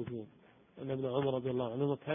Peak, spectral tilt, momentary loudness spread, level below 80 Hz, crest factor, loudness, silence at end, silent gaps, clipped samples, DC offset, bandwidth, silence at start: -18 dBFS; -6 dB/octave; 13 LU; -68 dBFS; 18 dB; -36 LUFS; 0 s; none; under 0.1%; under 0.1%; 3.7 kHz; 0 s